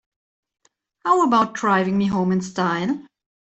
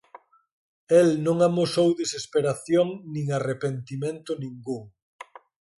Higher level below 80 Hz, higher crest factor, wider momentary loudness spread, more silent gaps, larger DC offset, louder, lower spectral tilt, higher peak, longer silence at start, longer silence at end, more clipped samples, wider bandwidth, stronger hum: first, -60 dBFS vs -68 dBFS; about the same, 18 dB vs 18 dB; second, 9 LU vs 15 LU; neither; neither; first, -20 LUFS vs -25 LUFS; about the same, -6 dB/octave vs -6 dB/octave; first, -4 dBFS vs -8 dBFS; first, 1.05 s vs 0.9 s; second, 0.45 s vs 0.9 s; neither; second, 8.2 kHz vs 11.5 kHz; neither